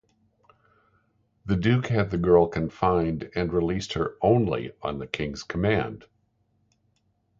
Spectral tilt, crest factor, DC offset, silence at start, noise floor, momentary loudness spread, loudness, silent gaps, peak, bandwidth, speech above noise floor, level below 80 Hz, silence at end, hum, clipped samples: -7 dB/octave; 22 dB; under 0.1%; 1.45 s; -70 dBFS; 11 LU; -25 LUFS; none; -6 dBFS; 7.8 kHz; 45 dB; -46 dBFS; 1.4 s; none; under 0.1%